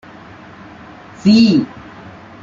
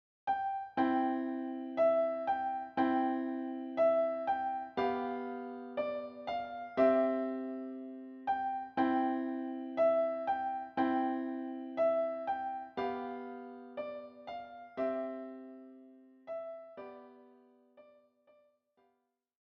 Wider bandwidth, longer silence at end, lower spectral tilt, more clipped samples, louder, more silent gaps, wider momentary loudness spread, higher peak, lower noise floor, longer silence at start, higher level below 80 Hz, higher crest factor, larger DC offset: first, 7.6 kHz vs 5.8 kHz; second, 0.75 s vs 1.75 s; about the same, -6.5 dB/octave vs -7.5 dB/octave; neither; first, -12 LUFS vs -35 LUFS; neither; first, 27 LU vs 16 LU; first, -2 dBFS vs -16 dBFS; second, -37 dBFS vs -80 dBFS; first, 1.25 s vs 0.25 s; first, -52 dBFS vs -76 dBFS; about the same, 16 dB vs 20 dB; neither